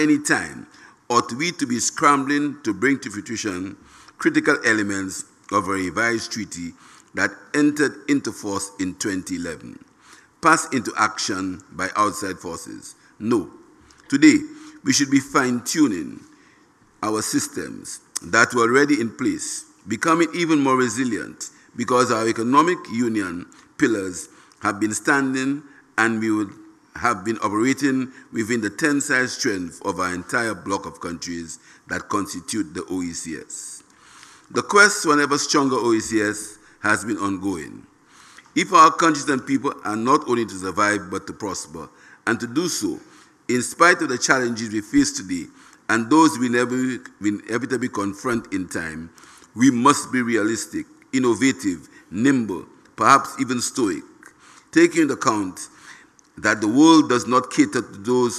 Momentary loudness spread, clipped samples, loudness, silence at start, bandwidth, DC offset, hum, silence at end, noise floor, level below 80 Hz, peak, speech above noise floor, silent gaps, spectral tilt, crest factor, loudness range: 16 LU; under 0.1%; -21 LUFS; 0 s; 13.5 kHz; under 0.1%; none; 0 s; -55 dBFS; -60 dBFS; 0 dBFS; 35 dB; none; -3.5 dB/octave; 22 dB; 5 LU